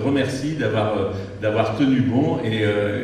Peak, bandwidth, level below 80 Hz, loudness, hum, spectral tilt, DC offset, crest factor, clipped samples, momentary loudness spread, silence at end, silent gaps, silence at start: -6 dBFS; 10.5 kHz; -52 dBFS; -21 LUFS; none; -7 dB/octave; under 0.1%; 14 dB; under 0.1%; 5 LU; 0 s; none; 0 s